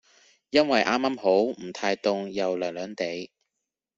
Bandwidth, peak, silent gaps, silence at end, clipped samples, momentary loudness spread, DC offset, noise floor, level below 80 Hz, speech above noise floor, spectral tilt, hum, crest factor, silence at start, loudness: 7.8 kHz; -6 dBFS; none; 0.7 s; under 0.1%; 10 LU; under 0.1%; -85 dBFS; -66 dBFS; 59 dB; -4.5 dB/octave; none; 20 dB; 0.55 s; -26 LUFS